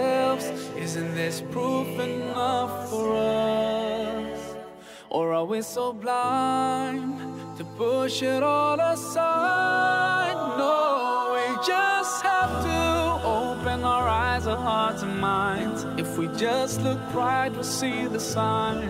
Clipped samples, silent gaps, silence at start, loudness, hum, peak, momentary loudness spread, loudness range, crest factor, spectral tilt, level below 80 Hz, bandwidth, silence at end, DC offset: under 0.1%; none; 0 s; -25 LUFS; none; -12 dBFS; 8 LU; 4 LU; 14 dB; -4.5 dB/octave; -48 dBFS; 16 kHz; 0 s; under 0.1%